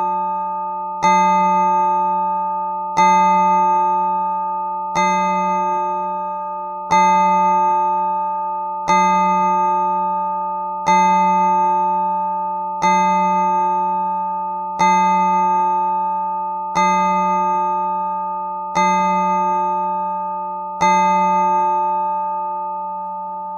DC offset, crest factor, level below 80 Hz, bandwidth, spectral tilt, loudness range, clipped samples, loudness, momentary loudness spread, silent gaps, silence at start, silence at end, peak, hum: under 0.1%; 14 dB; -60 dBFS; 7.2 kHz; -5 dB/octave; 2 LU; under 0.1%; -17 LUFS; 9 LU; none; 0 s; 0 s; -4 dBFS; none